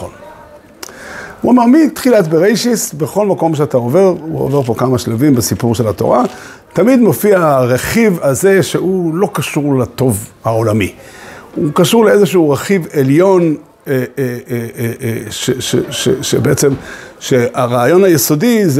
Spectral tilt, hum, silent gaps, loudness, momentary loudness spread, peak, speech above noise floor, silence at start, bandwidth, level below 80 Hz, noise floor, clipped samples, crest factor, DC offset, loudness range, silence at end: -5.5 dB/octave; none; none; -12 LUFS; 11 LU; 0 dBFS; 26 dB; 0 s; 16.5 kHz; -46 dBFS; -37 dBFS; under 0.1%; 12 dB; under 0.1%; 4 LU; 0 s